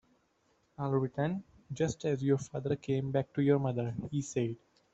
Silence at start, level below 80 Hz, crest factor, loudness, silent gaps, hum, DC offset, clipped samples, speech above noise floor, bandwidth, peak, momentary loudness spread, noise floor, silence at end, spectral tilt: 0.8 s; -64 dBFS; 18 dB; -33 LUFS; none; none; under 0.1%; under 0.1%; 41 dB; 8.2 kHz; -16 dBFS; 8 LU; -73 dBFS; 0.4 s; -7 dB/octave